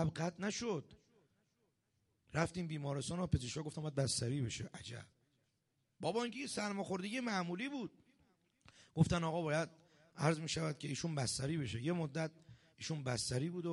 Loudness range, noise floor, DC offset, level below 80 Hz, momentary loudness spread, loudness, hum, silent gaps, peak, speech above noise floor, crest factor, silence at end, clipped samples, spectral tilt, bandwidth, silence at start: 4 LU; -83 dBFS; under 0.1%; -62 dBFS; 9 LU; -40 LUFS; none; none; -18 dBFS; 43 dB; 22 dB; 0 s; under 0.1%; -5 dB/octave; 11.5 kHz; 0 s